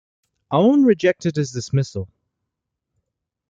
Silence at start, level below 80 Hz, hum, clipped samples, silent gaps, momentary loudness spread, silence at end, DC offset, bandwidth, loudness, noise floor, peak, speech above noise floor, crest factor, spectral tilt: 0.5 s; -60 dBFS; none; under 0.1%; none; 14 LU; 1.45 s; under 0.1%; 7.8 kHz; -19 LUFS; -81 dBFS; -4 dBFS; 63 dB; 18 dB; -7 dB/octave